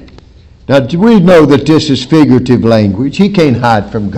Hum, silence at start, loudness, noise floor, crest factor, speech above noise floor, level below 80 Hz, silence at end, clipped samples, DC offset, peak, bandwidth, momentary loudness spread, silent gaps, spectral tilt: none; 0.7 s; -8 LUFS; -37 dBFS; 8 dB; 30 dB; -36 dBFS; 0 s; 7%; under 0.1%; 0 dBFS; 11.5 kHz; 6 LU; none; -7 dB/octave